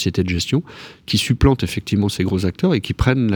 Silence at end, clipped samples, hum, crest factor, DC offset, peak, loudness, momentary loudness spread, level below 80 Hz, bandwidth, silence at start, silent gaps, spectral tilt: 0 s; under 0.1%; none; 16 dB; under 0.1%; -2 dBFS; -19 LUFS; 5 LU; -30 dBFS; over 20 kHz; 0 s; none; -6 dB/octave